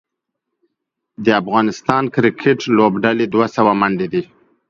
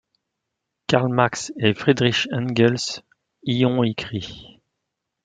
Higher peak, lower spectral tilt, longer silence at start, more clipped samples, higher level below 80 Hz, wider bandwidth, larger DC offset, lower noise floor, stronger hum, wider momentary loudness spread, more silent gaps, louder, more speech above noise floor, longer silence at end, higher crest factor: about the same, 0 dBFS vs -2 dBFS; about the same, -6.5 dB/octave vs -5.5 dB/octave; first, 1.2 s vs 0.9 s; neither; about the same, -56 dBFS vs -58 dBFS; second, 7.4 kHz vs 9.4 kHz; neither; second, -77 dBFS vs -81 dBFS; neither; second, 6 LU vs 14 LU; neither; first, -16 LUFS vs -21 LUFS; about the same, 62 dB vs 60 dB; second, 0.45 s vs 0.8 s; second, 16 dB vs 22 dB